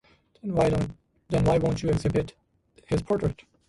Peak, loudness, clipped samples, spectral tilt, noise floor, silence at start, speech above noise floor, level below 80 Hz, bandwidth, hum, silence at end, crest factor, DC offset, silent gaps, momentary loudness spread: -10 dBFS; -26 LUFS; under 0.1%; -7.5 dB/octave; -59 dBFS; 0.45 s; 34 dB; -42 dBFS; 11.5 kHz; none; 0.3 s; 16 dB; under 0.1%; none; 9 LU